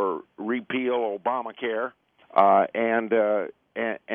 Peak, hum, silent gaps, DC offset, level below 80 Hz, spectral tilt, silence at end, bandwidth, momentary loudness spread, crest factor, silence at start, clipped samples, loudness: -4 dBFS; none; none; under 0.1%; -78 dBFS; -8.5 dB/octave; 0 s; 4 kHz; 11 LU; 22 dB; 0 s; under 0.1%; -25 LUFS